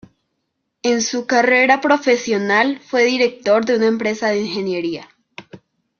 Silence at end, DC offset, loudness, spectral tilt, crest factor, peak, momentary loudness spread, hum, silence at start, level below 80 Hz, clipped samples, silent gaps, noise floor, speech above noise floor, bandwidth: 0.45 s; under 0.1%; -17 LUFS; -3.5 dB/octave; 16 dB; -2 dBFS; 9 LU; none; 0.85 s; -64 dBFS; under 0.1%; none; -73 dBFS; 57 dB; 7.2 kHz